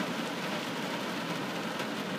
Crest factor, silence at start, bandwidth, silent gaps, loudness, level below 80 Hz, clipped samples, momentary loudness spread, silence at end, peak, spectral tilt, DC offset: 14 dB; 0 s; 15.5 kHz; none; -34 LUFS; -78 dBFS; under 0.1%; 1 LU; 0 s; -20 dBFS; -4 dB/octave; under 0.1%